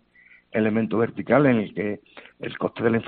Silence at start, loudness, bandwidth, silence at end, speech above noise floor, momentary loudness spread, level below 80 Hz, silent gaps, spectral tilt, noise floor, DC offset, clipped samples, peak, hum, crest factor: 0.55 s; -23 LUFS; 4.5 kHz; 0 s; 32 dB; 15 LU; -60 dBFS; none; -6.5 dB/octave; -55 dBFS; under 0.1%; under 0.1%; -6 dBFS; none; 18 dB